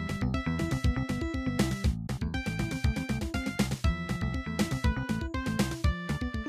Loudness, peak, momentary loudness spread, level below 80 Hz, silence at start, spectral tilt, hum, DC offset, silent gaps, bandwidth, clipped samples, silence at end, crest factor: -31 LUFS; -14 dBFS; 4 LU; -36 dBFS; 0 s; -6 dB/octave; none; under 0.1%; none; 15.5 kHz; under 0.1%; 0 s; 16 dB